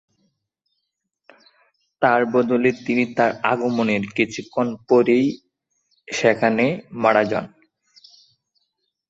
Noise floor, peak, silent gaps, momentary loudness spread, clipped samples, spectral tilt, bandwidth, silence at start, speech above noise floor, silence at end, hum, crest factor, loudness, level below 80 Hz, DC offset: -77 dBFS; -2 dBFS; none; 7 LU; under 0.1%; -5.5 dB/octave; 8 kHz; 2 s; 58 dB; 1.6 s; none; 20 dB; -20 LUFS; -64 dBFS; under 0.1%